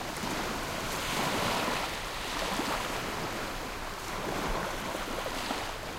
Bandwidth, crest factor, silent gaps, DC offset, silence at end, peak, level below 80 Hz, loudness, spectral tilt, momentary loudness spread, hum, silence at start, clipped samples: 16 kHz; 16 dB; none; under 0.1%; 0 s; -16 dBFS; -46 dBFS; -33 LUFS; -3 dB/octave; 6 LU; none; 0 s; under 0.1%